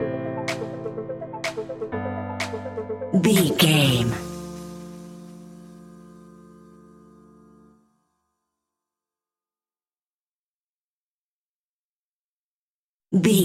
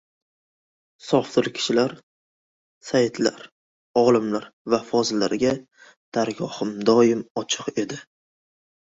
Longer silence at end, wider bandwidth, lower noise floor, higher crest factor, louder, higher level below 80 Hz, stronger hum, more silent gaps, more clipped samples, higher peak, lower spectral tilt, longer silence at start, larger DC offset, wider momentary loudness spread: second, 0 s vs 1 s; first, 16 kHz vs 8 kHz; about the same, under -90 dBFS vs under -90 dBFS; about the same, 24 dB vs 20 dB; about the same, -24 LUFS vs -23 LUFS; first, -56 dBFS vs -64 dBFS; neither; first, 10.13-13.00 s vs 2.03-2.81 s, 3.52-3.94 s, 4.53-4.65 s, 5.97-6.12 s, 7.30-7.35 s; neither; about the same, -4 dBFS vs -4 dBFS; about the same, -5 dB/octave vs -4.5 dB/octave; second, 0 s vs 1.05 s; neither; first, 25 LU vs 11 LU